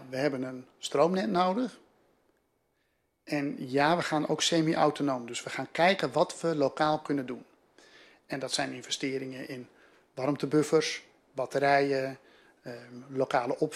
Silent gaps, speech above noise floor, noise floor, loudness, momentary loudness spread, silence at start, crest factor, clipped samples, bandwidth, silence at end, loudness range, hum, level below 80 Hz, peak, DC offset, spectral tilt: none; 46 dB; -75 dBFS; -29 LUFS; 15 LU; 0 s; 20 dB; under 0.1%; 14.5 kHz; 0 s; 5 LU; none; -74 dBFS; -10 dBFS; under 0.1%; -4.5 dB/octave